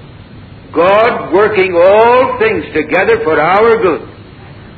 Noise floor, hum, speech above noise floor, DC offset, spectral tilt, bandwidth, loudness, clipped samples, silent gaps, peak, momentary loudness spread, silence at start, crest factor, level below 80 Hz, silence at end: -33 dBFS; none; 24 dB; under 0.1%; -8 dB/octave; 4.8 kHz; -10 LUFS; under 0.1%; none; 0 dBFS; 7 LU; 0 s; 10 dB; -40 dBFS; 0.05 s